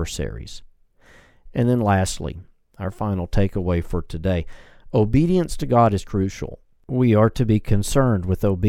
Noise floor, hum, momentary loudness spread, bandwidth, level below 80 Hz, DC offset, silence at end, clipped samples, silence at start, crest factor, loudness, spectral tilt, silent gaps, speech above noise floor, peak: -52 dBFS; none; 15 LU; 15.5 kHz; -34 dBFS; under 0.1%; 0 s; under 0.1%; 0 s; 18 dB; -21 LUFS; -7 dB/octave; none; 32 dB; -2 dBFS